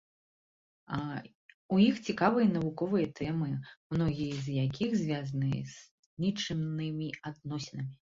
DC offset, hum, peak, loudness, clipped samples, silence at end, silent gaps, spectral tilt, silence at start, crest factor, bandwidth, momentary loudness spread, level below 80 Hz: under 0.1%; none; -12 dBFS; -32 LUFS; under 0.1%; 0.15 s; 1.35-1.69 s, 3.77-3.90 s, 5.91-6.17 s; -7 dB/octave; 0.9 s; 20 dB; 7.6 kHz; 13 LU; -62 dBFS